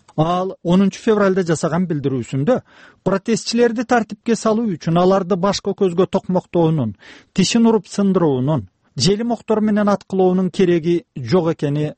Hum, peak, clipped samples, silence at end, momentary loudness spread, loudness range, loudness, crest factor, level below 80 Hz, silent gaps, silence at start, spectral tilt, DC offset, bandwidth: none; -4 dBFS; under 0.1%; 0.05 s; 6 LU; 1 LU; -18 LUFS; 14 dB; -50 dBFS; none; 0.15 s; -6 dB/octave; under 0.1%; 8.8 kHz